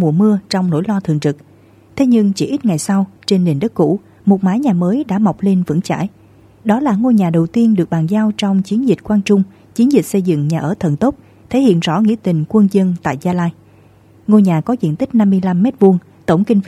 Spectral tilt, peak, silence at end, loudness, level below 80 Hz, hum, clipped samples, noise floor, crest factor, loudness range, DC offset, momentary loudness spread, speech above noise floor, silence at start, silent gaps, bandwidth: -7.5 dB/octave; 0 dBFS; 0 s; -15 LUFS; -52 dBFS; none; under 0.1%; -46 dBFS; 14 dB; 2 LU; under 0.1%; 6 LU; 32 dB; 0 s; none; 13 kHz